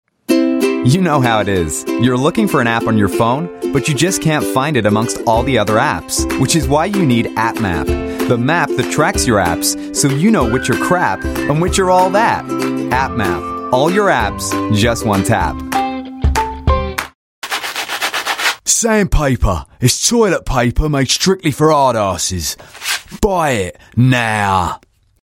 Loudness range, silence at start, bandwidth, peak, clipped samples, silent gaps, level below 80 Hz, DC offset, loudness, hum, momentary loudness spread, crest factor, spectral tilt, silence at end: 2 LU; 0.3 s; 16.5 kHz; 0 dBFS; under 0.1%; 17.15-17.42 s; -28 dBFS; under 0.1%; -15 LUFS; none; 7 LU; 14 dB; -4.5 dB/octave; 0.5 s